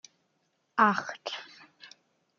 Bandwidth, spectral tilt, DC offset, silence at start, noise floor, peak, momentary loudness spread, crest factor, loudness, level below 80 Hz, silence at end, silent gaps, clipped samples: 7.4 kHz; -4 dB/octave; under 0.1%; 0.75 s; -75 dBFS; -8 dBFS; 24 LU; 24 dB; -28 LUFS; -82 dBFS; 0.5 s; none; under 0.1%